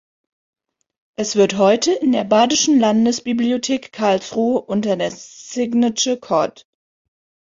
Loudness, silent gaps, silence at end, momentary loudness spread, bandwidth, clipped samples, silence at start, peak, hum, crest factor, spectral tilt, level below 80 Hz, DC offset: -17 LUFS; none; 1.05 s; 10 LU; 7.6 kHz; under 0.1%; 1.2 s; -2 dBFS; none; 18 dB; -4 dB/octave; -60 dBFS; under 0.1%